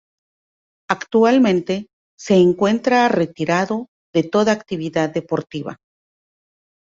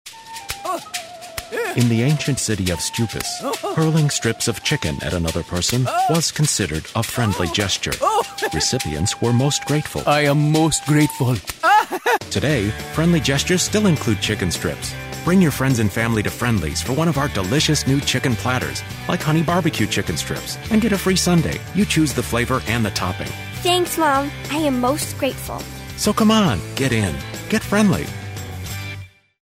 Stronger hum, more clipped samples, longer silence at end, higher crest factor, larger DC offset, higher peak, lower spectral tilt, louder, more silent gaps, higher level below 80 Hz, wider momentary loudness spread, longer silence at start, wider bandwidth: neither; neither; first, 1.2 s vs 0.4 s; about the same, 20 dB vs 16 dB; neither; first, 0 dBFS vs -4 dBFS; first, -6 dB/octave vs -4.5 dB/octave; about the same, -18 LUFS vs -19 LUFS; first, 1.93-2.18 s, 3.88-4.13 s vs none; second, -60 dBFS vs -40 dBFS; about the same, 12 LU vs 10 LU; first, 0.9 s vs 0.05 s; second, 7.8 kHz vs 16 kHz